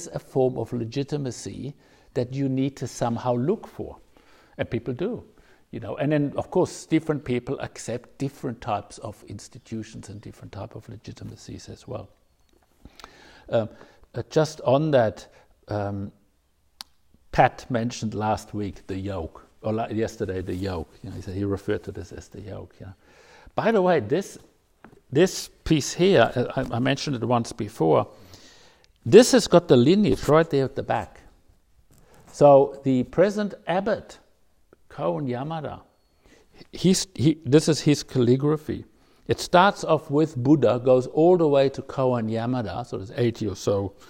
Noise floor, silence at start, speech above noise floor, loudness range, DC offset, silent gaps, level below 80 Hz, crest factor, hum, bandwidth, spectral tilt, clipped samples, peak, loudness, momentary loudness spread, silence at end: -66 dBFS; 0 s; 42 dB; 13 LU; under 0.1%; none; -52 dBFS; 24 dB; none; 16 kHz; -6 dB/octave; under 0.1%; 0 dBFS; -23 LUFS; 20 LU; 0.2 s